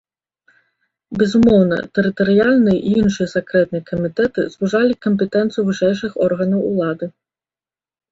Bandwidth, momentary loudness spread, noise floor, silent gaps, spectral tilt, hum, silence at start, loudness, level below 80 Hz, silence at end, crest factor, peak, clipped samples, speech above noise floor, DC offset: 7.8 kHz; 8 LU; under -90 dBFS; none; -7 dB/octave; none; 1.1 s; -17 LUFS; -48 dBFS; 1.05 s; 16 dB; -2 dBFS; under 0.1%; over 74 dB; under 0.1%